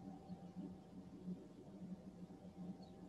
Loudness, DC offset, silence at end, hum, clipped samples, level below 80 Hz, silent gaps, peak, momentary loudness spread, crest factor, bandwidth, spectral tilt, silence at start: -55 LUFS; under 0.1%; 0 s; none; under 0.1%; -74 dBFS; none; -40 dBFS; 5 LU; 14 dB; 11.5 kHz; -8.5 dB/octave; 0 s